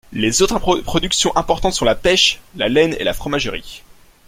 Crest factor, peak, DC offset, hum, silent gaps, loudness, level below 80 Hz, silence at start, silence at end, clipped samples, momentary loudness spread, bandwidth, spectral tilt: 16 dB; 0 dBFS; under 0.1%; none; none; -16 LUFS; -34 dBFS; 0.1 s; 0.5 s; under 0.1%; 8 LU; 16.5 kHz; -3 dB/octave